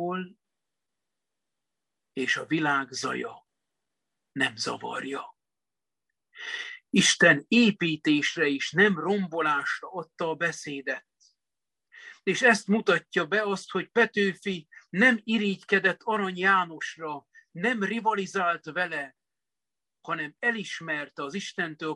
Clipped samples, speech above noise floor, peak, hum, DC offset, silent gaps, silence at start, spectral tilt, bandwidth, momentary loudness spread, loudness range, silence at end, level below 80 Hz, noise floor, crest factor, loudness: under 0.1%; over 63 dB; -6 dBFS; none; under 0.1%; none; 0 s; -4 dB/octave; 12 kHz; 14 LU; 8 LU; 0 s; -74 dBFS; under -90 dBFS; 22 dB; -26 LUFS